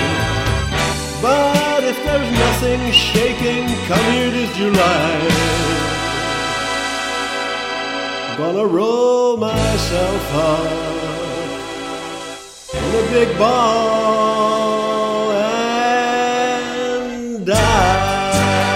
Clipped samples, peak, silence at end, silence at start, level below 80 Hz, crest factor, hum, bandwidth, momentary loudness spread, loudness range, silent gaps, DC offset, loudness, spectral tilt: under 0.1%; 0 dBFS; 0 s; 0 s; -32 dBFS; 16 dB; none; 16.5 kHz; 9 LU; 4 LU; none; under 0.1%; -17 LUFS; -4.5 dB/octave